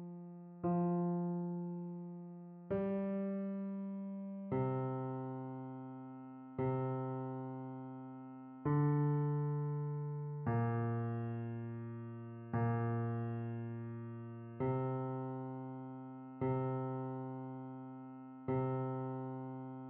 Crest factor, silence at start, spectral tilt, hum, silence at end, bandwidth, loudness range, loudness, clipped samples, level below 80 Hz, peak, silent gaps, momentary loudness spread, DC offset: 16 dB; 0 s; -10.5 dB/octave; none; 0 s; 3.4 kHz; 5 LU; -40 LUFS; under 0.1%; -72 dBFS; -24 dBFS; none; 14 LU; under 0.1%